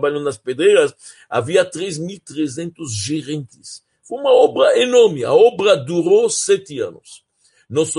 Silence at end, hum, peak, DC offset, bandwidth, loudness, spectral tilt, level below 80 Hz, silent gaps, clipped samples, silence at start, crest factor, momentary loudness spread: 0 s; none; -2 dBFS; under 0.1%; 11.5 kHz; -16 LUFS; -4 dB/octave; -64 dBFS; none; under 0.1%; 0 s; 16 dB; 15 LU